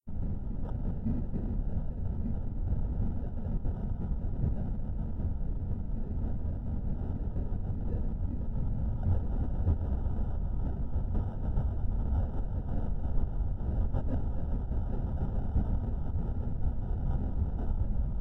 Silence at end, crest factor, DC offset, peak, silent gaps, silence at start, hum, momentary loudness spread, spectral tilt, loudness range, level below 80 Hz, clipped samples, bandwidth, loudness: 0 s; 14 dB; under 0.1%; -16 dBFS; none; 0.05 s; none; 4 LU; -12 dB/octave; 2 LU; -32 dBFS; under 0.1%; 3 kHz; -35 LUFS